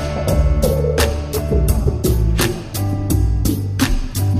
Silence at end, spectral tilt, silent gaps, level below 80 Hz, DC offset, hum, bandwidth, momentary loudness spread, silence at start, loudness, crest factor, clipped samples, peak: 0 s; -5.5 dB/octave; none; -20 dBFS; under 0.1%; none; 15.5 kHz; 4 LU; 0 s; -18 LUFS; 14 dB; under 0.1%; -2 dBFS